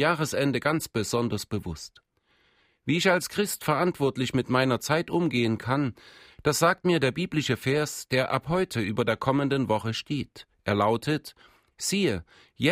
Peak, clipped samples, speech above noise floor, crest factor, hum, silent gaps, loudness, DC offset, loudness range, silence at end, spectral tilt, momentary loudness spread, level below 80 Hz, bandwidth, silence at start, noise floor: -8 dBFS; under 0.1%; 41 dB; 20 dB; none; none; -26 LUFS; under 0.1%; 3 LU; 0 s; -5 dB/octave; 9 LU; -58 dBFS; 16 kHz; 0 s; -67 dBFS